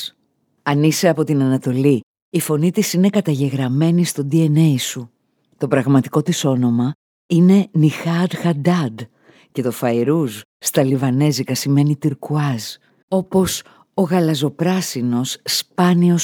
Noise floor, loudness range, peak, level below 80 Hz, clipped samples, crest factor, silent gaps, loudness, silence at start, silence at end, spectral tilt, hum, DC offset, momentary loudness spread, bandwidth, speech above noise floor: -65 dBFS; 3 LU; -2 dBFS; -58 dBFS; under 0.1%; 16 dB; 2.03-2.14 s, 2.22-2.32 s, 6.95-7.29 s, 10.45-10.60 s, 13.03-13.08 s; -18 LUFS; 0 s; 0 s; -6 dB/octave; none; under 0.1%; 10 LU; 19 kHz; 49 dB